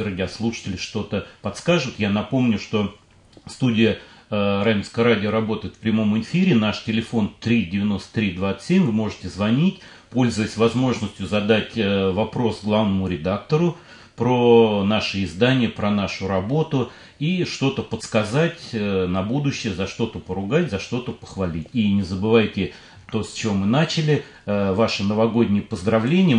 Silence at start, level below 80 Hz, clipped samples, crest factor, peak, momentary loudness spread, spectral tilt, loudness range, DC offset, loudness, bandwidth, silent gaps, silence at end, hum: 0 s; -54 dBFS; under 0.1%; 18 dB; -4 dBFS; 9 LU; -6.5 dB/octave; 4 LU; under 0.1%; -21 LUFS; 10.5 kHz; none; 0 s; none